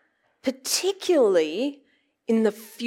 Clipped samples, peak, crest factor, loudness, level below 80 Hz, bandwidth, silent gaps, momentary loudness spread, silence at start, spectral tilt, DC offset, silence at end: under 0.1%; -10 dBFS; 16 dB; -24 LUFS; -80 dBFS; 16.5 kHz; none; 11 LU; 0.45 s; -3 dB/octave; under 0.1%; 0 s